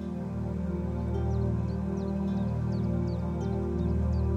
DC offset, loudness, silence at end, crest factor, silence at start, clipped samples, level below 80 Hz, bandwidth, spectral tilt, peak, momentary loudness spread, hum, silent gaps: under 0.1%; -31 LUFS; 0 s; 12 dB; 0 s; under 0.1%; -36 dBFS; 7 kHz; -10 dB/octave; -16 dBFS; 3 LU; none; none